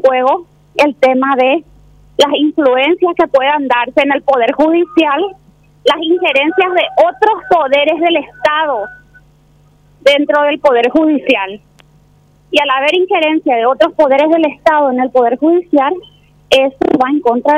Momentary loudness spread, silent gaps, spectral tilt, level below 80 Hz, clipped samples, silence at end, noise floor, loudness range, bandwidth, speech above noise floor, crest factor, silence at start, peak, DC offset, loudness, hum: 4 LU; none; -4 dB/octave; -50 dBFS; under 0.1%; 0 s; -48 dBFS; 2 LU; 13 kHz; 37 dB; 12 dB; 0.05 s; 0 dBFS; under 0.1%; -12 LUFS; none